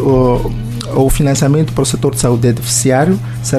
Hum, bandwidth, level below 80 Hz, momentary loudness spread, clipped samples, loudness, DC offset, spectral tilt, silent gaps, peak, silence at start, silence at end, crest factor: none; 14.5 kHz; -26 dBFS; 6 LU; under 0.1%; -13 LUFS; under 0.1%; -5.5 dB/octave; none; 0 dBFS; 0 s; 0 s; 12 dB